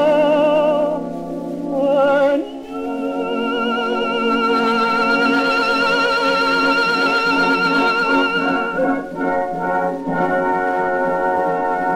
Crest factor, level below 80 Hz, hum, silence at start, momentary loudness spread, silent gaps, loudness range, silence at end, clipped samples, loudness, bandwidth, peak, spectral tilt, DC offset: 14 dB; -50 dBFS; none; 0 s; 7 LU; none; 4 LU; 0 s; under 0.1%; -17 LUFS; 15.5 kHz; -4 dBFS; -5 dB/octave; under 0.1%